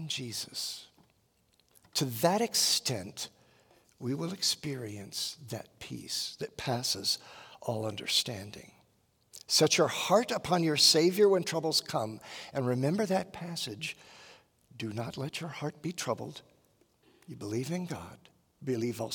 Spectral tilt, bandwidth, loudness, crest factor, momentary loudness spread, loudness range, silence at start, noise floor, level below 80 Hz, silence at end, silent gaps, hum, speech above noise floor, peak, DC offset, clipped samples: -3.5 dB/octave; 18 kHz; -30 LUFS; 22 dB; 17 LU; 12 LU; 0 s; -71 dBFS; -72 dBFS; 0 s; none; none; 39 dB; -12 dBFS; under 0.1%; under 0.1%